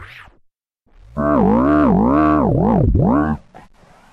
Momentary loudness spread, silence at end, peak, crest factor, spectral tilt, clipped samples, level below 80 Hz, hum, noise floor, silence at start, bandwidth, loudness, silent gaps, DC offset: 9 LU; 0.75 s; -6 dBFS; 10 dB; -10.5 dB/octave; under 0.1%; -28 dBFS; none; -60 dBFS; 0 s; 5 kHz; -15 LUFS; none; under 0.1%